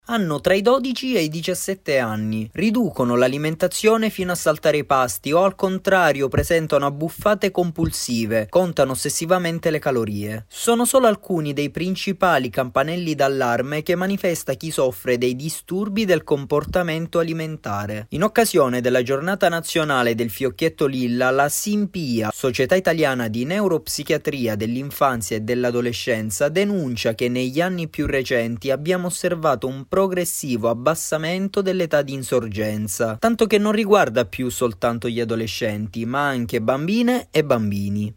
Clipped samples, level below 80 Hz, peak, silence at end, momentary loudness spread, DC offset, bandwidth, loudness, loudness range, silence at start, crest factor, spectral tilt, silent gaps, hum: under 0.1%; -48 dBFS; -4 dBFS; 0.05 s; 6 LU; under 0.1%; 16.5 kHz; -21 LUFS; 3 LU; 0.1 s; 16 dB; -5 dB/octave; none; none